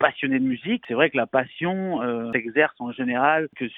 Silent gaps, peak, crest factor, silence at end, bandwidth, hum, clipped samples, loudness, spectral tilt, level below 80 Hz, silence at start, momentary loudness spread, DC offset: none; -2 dBFS; 20 dB; 0 s; 3.9 kHz; none; under 0.1%; -23 LUFS; -9 dB/octave; -66 dBFS; 0 s; 6 LU; under 0.1%